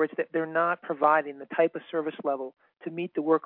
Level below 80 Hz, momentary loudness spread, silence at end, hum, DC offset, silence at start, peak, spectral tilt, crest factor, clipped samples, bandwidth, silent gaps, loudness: -88 dBFS; 12 LU; 0.05 s; none; under 0.1%; 0 s; -8 dBFS; -9.5 dB/octave; 20 dB; under 0.1%; 4.2 kHz; none; -28 LUFS